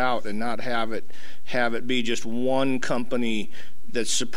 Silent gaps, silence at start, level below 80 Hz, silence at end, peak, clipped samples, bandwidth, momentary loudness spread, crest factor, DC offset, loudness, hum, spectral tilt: none; 0 s; -54 dBFS; 0 s; -10 dBFS; under 0.1%; 16 kHz; 12 LU; 20 dB; 9%; -27 LUFS; none; -3.5 dB/octave